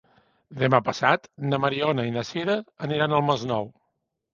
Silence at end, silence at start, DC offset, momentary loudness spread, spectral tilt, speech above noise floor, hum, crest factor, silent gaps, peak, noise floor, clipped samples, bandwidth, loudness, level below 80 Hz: 0.65 s; 0.5 s; under 0.1%; 8 LU; -6 dB/octave; 53 dB; none; 24 dB; none; -2 dBFS; -77 dBFS; under 0.1%; 7.4 kHz; -24 LUFS; -62 dBFS